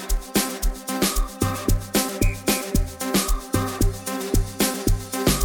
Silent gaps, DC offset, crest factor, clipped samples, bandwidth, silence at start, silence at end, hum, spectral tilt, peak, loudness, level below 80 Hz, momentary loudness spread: none; under 0.1%; 18 dB; under 0.1%; 19 kHz; 0 s; 0 s; none; -4 dB/octave; -4 dBFS; -24 LUFS; -26 dBFS; 4 LU